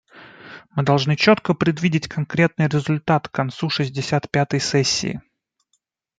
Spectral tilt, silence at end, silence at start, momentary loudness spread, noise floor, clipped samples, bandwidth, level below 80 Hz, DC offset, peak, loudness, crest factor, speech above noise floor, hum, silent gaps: -5 dB/octave; 1 s; 0.15 s; 10 LU; -71 dBFS; under 0.1%; 9.2 kHz; -56 dBFS; under 0.1%; -2 dBFS; -20 LUFS; 18 dB; 51 dB; none; none